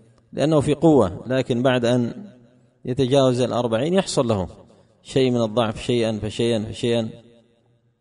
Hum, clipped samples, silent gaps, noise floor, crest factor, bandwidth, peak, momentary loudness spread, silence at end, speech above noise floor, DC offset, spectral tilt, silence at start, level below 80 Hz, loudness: none; under 0.1%; none; -61 dBFS; 18 dB; 10.5 kHz; -4 dBFS; 10 LU; 0.8 s; 41 dB; under 0.1%; -6 dB/octave; 0.35 s; -50 dBFS; -21 LUFS